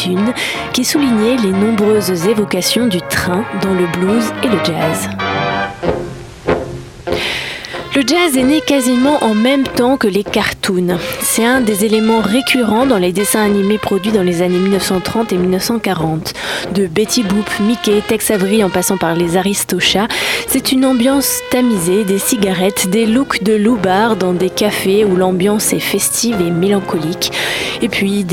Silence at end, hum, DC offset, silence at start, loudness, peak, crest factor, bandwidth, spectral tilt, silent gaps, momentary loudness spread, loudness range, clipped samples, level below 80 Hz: 0 s; none; under 0.1%; 0 s; -14 LUFS; 0 dBFS; 14 dB; 17.5 kHz; -4 dB/octave; none; 6 LU; 3 LU; under 0.1%; -42 dBFS